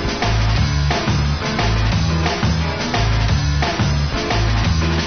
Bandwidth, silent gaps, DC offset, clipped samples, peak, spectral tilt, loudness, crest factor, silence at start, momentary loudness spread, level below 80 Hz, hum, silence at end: 6.6 kHz; none; under 0.1%; under 0.1%; -6 dBFS; -5.5 dB/octave; -18 LUFS; 12 dB; 0 s; 2 LU; -22 dBFS; none; 0 s